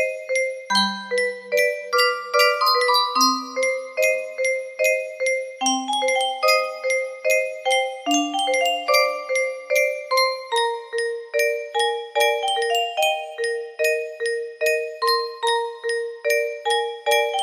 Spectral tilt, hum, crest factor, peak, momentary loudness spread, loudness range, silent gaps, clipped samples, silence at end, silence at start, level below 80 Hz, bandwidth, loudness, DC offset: -1 dB/octave; none; 18 dB; -4 dBFS; 6 LU; 3 LU; none; under 0.1%; 0 s; 0 s; -74 dBFS; 15.5 kHz; -21 LUFS; under 0.1%